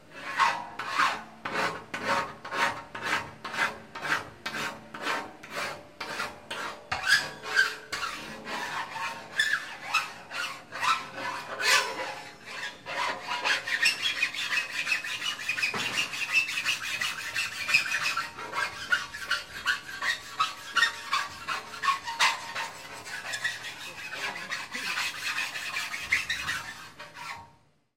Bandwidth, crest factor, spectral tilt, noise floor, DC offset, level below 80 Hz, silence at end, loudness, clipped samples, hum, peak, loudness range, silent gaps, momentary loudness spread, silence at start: 16.5 kHz; 24 dB; -0.5 dB/octave; -62 dBFS; 0.1%; -66 dBFS; 0.45 s; -29 LUFS; under 0.1%; none; -8 dBFS; 4 LU; none; 12 LU; 0 s